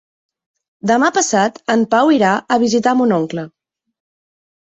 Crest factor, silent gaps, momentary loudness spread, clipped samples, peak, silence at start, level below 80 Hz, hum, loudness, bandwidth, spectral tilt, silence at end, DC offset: 16 dB; none; 11 LU; under 0.1%; -2 dBFS; 0.85 s; -60 dBFS; none; -15 LUFS; 8.4 kHz; -4 dB/octave; 1.2 s; under 0.1%